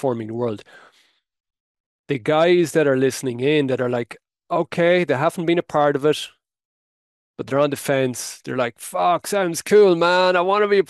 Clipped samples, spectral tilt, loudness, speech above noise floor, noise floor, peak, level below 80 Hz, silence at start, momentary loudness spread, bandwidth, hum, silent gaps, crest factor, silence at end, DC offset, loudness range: under 0.1%; -5 dB/octave; -19 LUFS; 42 dB; -61 dBFS; -4 dBFS; -68 dBFS; 0 s; 11 LU; 12.5 kHz; none; 1.60-2.04 s, 6.65-7.34 s; 16 dB; 0.05 s; under 0.1%; 4 LU